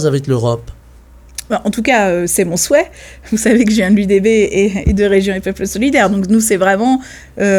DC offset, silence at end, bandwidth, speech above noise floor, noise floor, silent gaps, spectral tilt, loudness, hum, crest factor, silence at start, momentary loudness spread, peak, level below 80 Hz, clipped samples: under 0.1%; 0 s; 17.5 kHz; 27 dB; -40 dBFS; none; -5 dB/octave; -13 LUFS; none; 12 dB; 0 s; 9 LU; 0 dBFS; -32 dBFS; under 0.1%